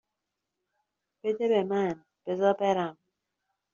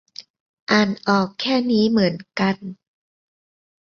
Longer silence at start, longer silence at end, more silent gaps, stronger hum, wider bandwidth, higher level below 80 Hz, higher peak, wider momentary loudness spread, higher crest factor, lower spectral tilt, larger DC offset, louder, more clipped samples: first, 1.25 s vs 0.2 s; second, 0.8 s vs 1.1 s; second, none vs 0.30-0.34 s, 0.40-0.67 s; neither; about the same, 7.2 kHz vs 7 kHz; second, -76 dBFS vs -60 dBFS; second, -12 dBFS vs -2 dBFS; second, 10 LU vs 19 LU; about the same, 18 dB vs 20 dB; about the same, -5 dB/octave vs -6 dB/octave; neither; second, -28 LUFS vs -20 LUFS; neither